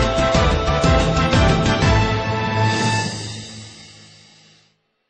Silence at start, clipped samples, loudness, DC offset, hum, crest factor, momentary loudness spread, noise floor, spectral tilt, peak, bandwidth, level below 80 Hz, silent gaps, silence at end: 0 s; under 0.1%; -17 LUFS; under 0.1%; none; 14 dB; 15 LU; -61 dBFS; -5 dB/octave; -4 dBFS; 9.8 kHz; -28 dBFS; none; 1.2 s